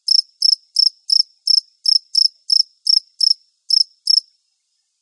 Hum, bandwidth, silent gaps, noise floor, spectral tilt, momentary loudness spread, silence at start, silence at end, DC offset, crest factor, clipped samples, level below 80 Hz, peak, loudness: none; 11.5 kHz; none; -69 dBFS; 12.5 dB/octave; 2 LU; 0.1 s; 0.8 s; under 0.1%; 14 dB; under 0.1%; under -90 dBFS; -4 dBFS; -14 LUFS